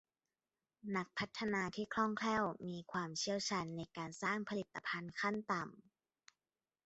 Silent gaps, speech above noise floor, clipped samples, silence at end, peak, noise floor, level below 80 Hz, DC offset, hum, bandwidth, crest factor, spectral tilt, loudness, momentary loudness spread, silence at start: none; over 49 dB; under 0.1%; 1.05 s; -22 dBFS; under -90 dBFS; -76 dBFS; under 0.1%; none; 8 kHz; 20 dB; -3.5 dB/octave; -41 LUFS; 8 LU; 0.85 s